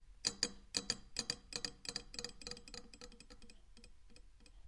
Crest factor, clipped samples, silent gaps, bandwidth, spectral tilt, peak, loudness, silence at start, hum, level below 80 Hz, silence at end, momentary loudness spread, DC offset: 30 dB; under 0.1%; none; 11.5 kHz; -1 dB/octave; -16 dBFS; -43 LUFS; 0 s; none; -62 dBFS; 0 s; 24 LU; under 0.1%